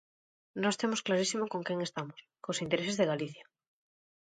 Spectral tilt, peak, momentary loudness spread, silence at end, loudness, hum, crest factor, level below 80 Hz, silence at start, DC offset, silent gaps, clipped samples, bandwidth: -4 dB/octave; -14 dBFS; 12 LU; 0.8 s; -33 LUFS; none; 20 dB; -76 dBFS; 0.55 s; under 0.1%; none; under 0.1%; 9.4 kHz